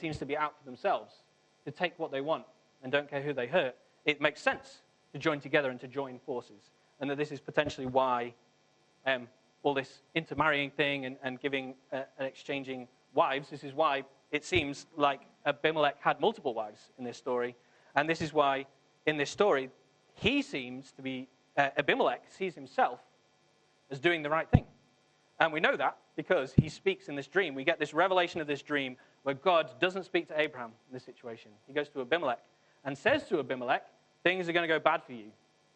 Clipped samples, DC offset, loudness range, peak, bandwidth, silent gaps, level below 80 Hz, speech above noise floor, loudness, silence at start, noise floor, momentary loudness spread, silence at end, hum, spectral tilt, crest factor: under 0.1%; under 0.1%; 4 LU; -6 dBFS; 9.2 kHz; none; -58 dBFS; 36 dB; -32 LUFS; 0 s; -68 dBFS; 13 LU; 0.45 s; none; -5.5 dB/octave; 26 dB